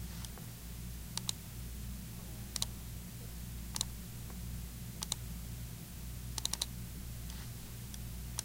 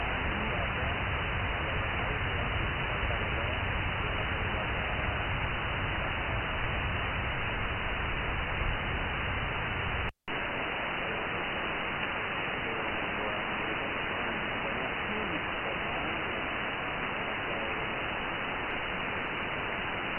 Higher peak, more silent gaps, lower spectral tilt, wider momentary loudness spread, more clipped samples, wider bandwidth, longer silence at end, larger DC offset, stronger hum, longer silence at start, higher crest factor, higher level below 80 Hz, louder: first, -14 dBFS vs -20 dBFS; neither; second, -3 dB/octave vs -7.5 dB/octave; first, 8 LU vs 2 LU; neither; first, 16.5 kHz vs 4 kHz; about the same, 0 s vs 0 s; neither; neither; about the same, 0 s vs 0 s; first, 30 dB vs 14 dB; second, -48 dBFS vs -42 dBFS; second, -43 LUFS vs -32 LUFS